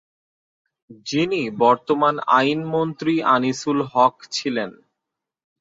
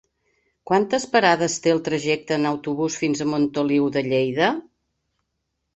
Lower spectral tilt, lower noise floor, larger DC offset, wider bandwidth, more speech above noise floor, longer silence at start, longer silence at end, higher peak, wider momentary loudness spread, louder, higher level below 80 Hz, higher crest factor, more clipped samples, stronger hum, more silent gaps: about the same, -5 dB/octave vs -4.5 dB/octave; first, -84 dBFS vs -77 dBFS; neither; about the same, 7.8 kHz vs 8.2 kHz; first, 64 dB vs 56 dB; first, 0.9 s vs 0.65 s; second, 0.9 s vs 1.15 s; about the same, -2 dBFS vs -4 dBFS; first, 8 LU vs 5 LU; about the same, -20 LUFS vs -21 LUFS; about the same, -64 dBFS vs -62 dBFS; about the same, 20 dB vs 20 dB; neither; neither; neither